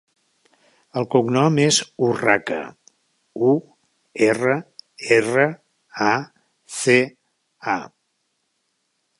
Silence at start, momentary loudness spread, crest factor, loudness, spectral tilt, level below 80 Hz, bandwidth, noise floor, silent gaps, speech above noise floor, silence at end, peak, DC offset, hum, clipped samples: 0.95 s; 19 LU; 20 dB; -20 LUFS; -4.5 dB/octave; -66 dBFS; 11.5 kHz; -72 dBFS; none; 53 dB; 1.35 s; -2 dBFS; under 0.1%; none; under 0.1%